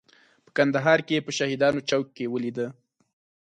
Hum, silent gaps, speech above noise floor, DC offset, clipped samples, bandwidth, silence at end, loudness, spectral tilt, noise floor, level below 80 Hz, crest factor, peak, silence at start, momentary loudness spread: none; none; 35 dB; under 0.1%; under 0.1%; 9.6 kHz; 0.7 s; -25 LUFS; -5 dB/octave; -59 dBFS; -68 dBFS; 20 dB; -6 dBFS; 0.55 s; 10 LU